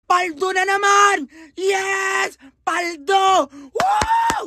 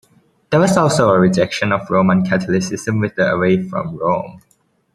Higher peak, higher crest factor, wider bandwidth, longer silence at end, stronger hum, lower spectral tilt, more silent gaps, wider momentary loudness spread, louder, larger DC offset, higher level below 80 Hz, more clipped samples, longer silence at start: about the same, 0 dBFS vs 0 dBFS; about the same, 18 dB vs 16 dB; about the same, 13.5 kHz vs 12.5 kHz; second, 0 s vs 0.55 s; neither; second, -2 dB/octave vs -6 dB/octave; neither; first, 10 LU vs 7 LU; about the same, -18 LUFS vs -16 LUFS; neither; about the same, -48 dBFS vs -52 dBFS; neither; second, 0.1 s vs 0.5 s